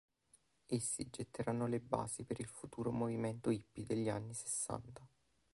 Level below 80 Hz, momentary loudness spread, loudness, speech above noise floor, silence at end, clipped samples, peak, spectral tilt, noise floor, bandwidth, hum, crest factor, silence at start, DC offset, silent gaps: -68 dBFS; 7 LU; -41 LUFS; 33 dB; 0.45 s; under 0.1%; -18 dBFS; -5.5 dB/octave; -74 dBFS; 11.5 kHz; none; 24 dB; 0.7 s; under 0.1%; none